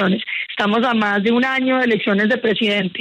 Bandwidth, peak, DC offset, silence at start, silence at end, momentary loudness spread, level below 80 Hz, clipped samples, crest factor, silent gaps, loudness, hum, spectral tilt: 8.8 kHz; -6 dBFS; under 0.1%; 0 s; 0 s; 3 LU; -62 dBFS; under 0.1%; 12 dB; none; -17 LUFS; none; -6.5 dB/octave